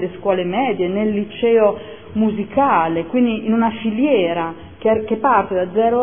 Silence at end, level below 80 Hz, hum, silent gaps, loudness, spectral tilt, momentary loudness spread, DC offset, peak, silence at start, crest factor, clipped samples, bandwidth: 0 s; -50 dBFS; none; none; -18 LUFS; -10.5 dB/octave; 5 LU; 0.5%; -2 dBFS; 0 s; 16 dB; under 0.1%; 3.6 kHz